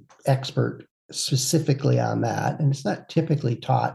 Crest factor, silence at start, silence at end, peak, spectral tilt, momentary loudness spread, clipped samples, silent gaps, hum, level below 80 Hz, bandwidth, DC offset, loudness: 16 dB; 0.25 s; 0 s; -8 dBFS; -5.5 dB/octave; 6 LU; under 0.1%; 0.91-1.09 s; none; -66 dBFS; 12.5 kHz; under 0.1%; -24 LUFS